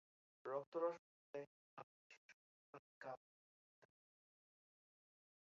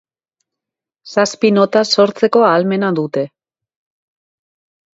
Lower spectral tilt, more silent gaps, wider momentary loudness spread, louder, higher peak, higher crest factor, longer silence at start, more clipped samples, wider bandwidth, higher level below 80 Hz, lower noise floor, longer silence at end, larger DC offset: about the same, -4.5 dB/octave vs -5 dB/octave; first, 0.67-0.72 s, 0.99-1.34 s, 1.47-1.77 s, 1.83-2.10 s, 2.17-2.73 s, 2.79-3.01 s, 3.17-3.82 s vs none; first, 21 LU vs 9 LU; second, -51 LUFS vs -14 LUFS; second, -32 dBFS vs 0 dBFS; first, 24 dB vs 16 dB; second, 0.45 s vs 1.05 s; neither; second, 7.2 kHz vs 8 kHz; second, under -90 dBFS vs -66 dBFS; first, under -90 dBFS vs -85 dBFS; about the same, 1.6 s vs 1.7 s; neither